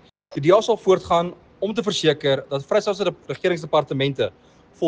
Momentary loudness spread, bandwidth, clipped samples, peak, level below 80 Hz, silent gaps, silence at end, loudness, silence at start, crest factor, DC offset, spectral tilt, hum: 9 LU; 9.6 kHz; under 0.1%; -4 dBFS; -56 dBFS; none; 0 s; -21 LUFS; 0.3 s; 18 dB; under 0.1%; -5.5 dB/octave; none